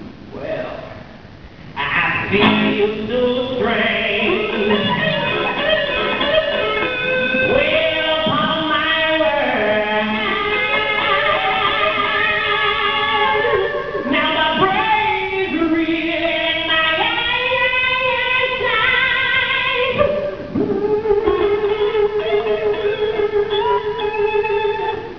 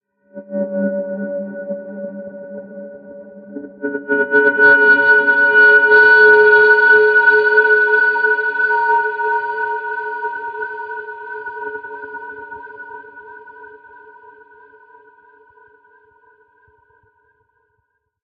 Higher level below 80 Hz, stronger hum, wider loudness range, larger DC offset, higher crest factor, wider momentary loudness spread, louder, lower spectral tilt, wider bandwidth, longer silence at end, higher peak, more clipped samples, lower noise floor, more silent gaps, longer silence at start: first, -44 dBFS vs -68 dBFS; neither; second, 3 LU vs 21 LU; first, 0.5% vs under 0.1%; about the same, 18 dB vs 16 dB; second, 5 LU vs 24 LU; second, -17 LUFS vs -12 LUFS; about the same, -6 dB/octave vs -6.5 dB/octave; about the same, 5.4 kHz vs 5.2 kHz; second, 0 s vs 4.6 s; about the same, 0 dBFS vs 0 dBFS; neither; second, -38 dBFS vs -69 dBFS; neither; second, 0 s vs 0.35 s